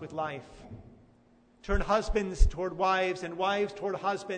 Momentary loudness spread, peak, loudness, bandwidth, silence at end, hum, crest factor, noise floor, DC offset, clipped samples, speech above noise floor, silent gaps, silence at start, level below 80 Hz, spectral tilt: 20 LU; -8 dBFS; -30 LUFS; 9.4 kHz; 0 s; none; 22 dB; -62 dBFS; under 0.1%; under 0.1%; 33 dB; none; 0 s; -34 dBFS; -5.5 dB/octave